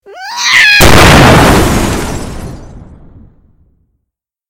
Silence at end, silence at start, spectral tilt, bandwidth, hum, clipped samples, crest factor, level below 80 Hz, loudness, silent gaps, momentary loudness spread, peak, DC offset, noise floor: 1.3 s; 0.1 s; -4 dB/octave; over 20 kHz; none; 3%; 8 dB; -20 dBFS; -5 LUFS; none; 20 LU; 0 dBFS; under 0.1%; -72 dBFS